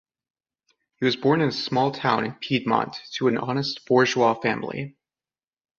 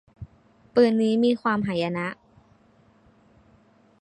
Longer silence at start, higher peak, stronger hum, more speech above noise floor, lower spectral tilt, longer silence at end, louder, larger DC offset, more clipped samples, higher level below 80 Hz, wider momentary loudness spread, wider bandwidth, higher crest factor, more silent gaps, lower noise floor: first, 1 s vs 0.2 s; first, -4 dBFS vs -8 dBFS; neither; first, over 67 dB vs 37 dB; second, -5.5 dB/octave vs -7 dB/octave; second, 0.9 s vs 1.9 s; about the same, -23 LUFS vs -23 LUFS; neither; neither; about the same, -64 dBFS vs -60 dBFS; second, 9 LU vs 26 LU; second, 7.4 kHz vs 9.2 kHz; about the same, 20 dB vs 20 dB; neither; first, under -90 dBFS vs -59 dBFS